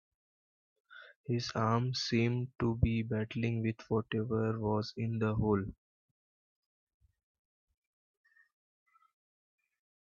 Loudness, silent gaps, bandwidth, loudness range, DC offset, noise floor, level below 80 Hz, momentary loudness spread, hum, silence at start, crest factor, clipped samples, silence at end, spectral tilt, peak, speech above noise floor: -34 LUFS; 1.16-1.24 s; 7.2 kHz; 6 LU; under 0.1%; under -90 dBFS; -56 dBFS; 5 LU; none; 0.9 s; 20 dB; under 0.1%; 4.3 s; -7 dB/octave; -16 dBFS; over 57 dB